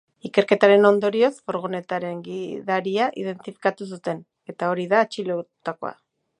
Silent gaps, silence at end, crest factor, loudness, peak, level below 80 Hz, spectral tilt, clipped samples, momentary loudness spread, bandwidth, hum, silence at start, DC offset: none; 0.5 s; 22 dB; -22 LUFS; -2 dBFS; -74 dBFS; -6 dB/octave; under 0.1%; 16 LU; 10 kHz; none; 0.25 s; under 0.1%